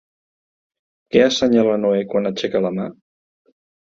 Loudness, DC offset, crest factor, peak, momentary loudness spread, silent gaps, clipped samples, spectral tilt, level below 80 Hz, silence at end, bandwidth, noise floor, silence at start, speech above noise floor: -18 LUFS; under 0.1%; 18 dB; -2 dBFS; 9 LU; none; under 0.1%; -5 dB/octave; -58 dBFS; 1.05 s; 7.6 kHz; under -90 dBFS; 1.15 s; over 73 dB